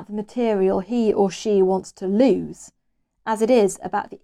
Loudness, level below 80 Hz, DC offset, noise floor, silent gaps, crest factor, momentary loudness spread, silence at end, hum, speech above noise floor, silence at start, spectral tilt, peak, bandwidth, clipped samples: -21 LUFS; -58 dBFS; under 0.1%; -67 dBFS; none; 16 dB; 9 LU; 0.05 s; none; 47 dB; 0 s; -6 dB/octave; -4 dBFS; 13 kHz; under 0.1%